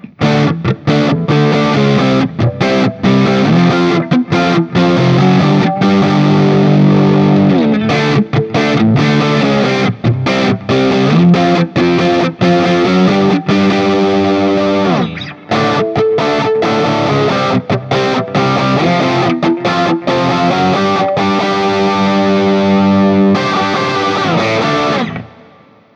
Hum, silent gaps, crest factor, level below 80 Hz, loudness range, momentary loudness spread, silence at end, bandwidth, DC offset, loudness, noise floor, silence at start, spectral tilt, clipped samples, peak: none; none; 10 dB; -46 dBFS; 3 LU; 4 LU; 0.7 s; 8 kHz; under 0.1%; -11 LUFS; -43 dBFS; 0.05 s; -7 dB/octave; under 0.1%; 0 dBFS